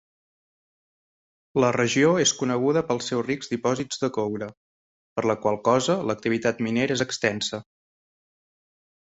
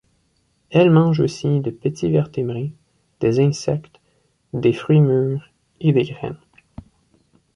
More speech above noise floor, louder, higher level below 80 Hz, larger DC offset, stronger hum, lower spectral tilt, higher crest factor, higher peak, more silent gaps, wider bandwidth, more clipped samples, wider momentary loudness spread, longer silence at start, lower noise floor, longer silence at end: first, over 66 dB vs 47 dB; second, -24 LUFS vs -19 LUFS; second, -62 dBFS vs -54 dBFS; neither; neither; second, -4 dB/octave vs -8 dB/octave; about the same, 20 dB vs 16 dB; about the same, -6 dBFS vs -4 dBFS; first, 4.57-5.16 s vs none; second, 8.2 kHz vs 10 kHz; neither; second, 9 LU vs 15 LU; first, 1.55 s vs 0.7 s; first, under -90 dBFS vs -64 dBFS; first, 1.4 s vs 1.2 s